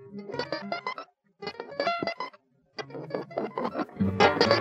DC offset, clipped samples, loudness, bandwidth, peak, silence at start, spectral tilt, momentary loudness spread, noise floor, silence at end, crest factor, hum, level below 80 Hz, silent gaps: under 0.1%; under 0.1%; -30 LUFS; 9 kHz; -6 dBFS; 0 s; -5.5 dB/octave; 18 LU; -57 dBFS; 0 s; 24 dB; none; -66 dBFS; none